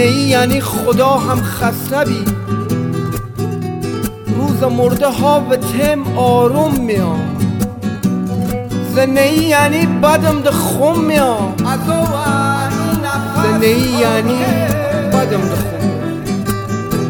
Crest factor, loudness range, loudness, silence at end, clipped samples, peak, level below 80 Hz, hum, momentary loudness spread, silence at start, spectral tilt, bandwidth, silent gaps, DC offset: 14 dB; 4 LU; -14 LUFS; 0 s; under 0.1%; 0 dBFS; -36 dBFS; none; 8 LU; 0 s; -5.5 dB/octave; 17.5 kHz; none; under 0.1%